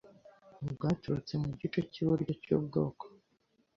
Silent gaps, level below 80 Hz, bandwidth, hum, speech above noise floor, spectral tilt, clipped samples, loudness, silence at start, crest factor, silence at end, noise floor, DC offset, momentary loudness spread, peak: none; -62 dBFS; 7.4 kHz; none; 41 dB; -8.5 dB/octave; under 0.1%; -35 LUFS; 0.05 s; 20 dB; 0.7 s; -74 dBFS; under 0.1%; 11 LU; -16 dBFS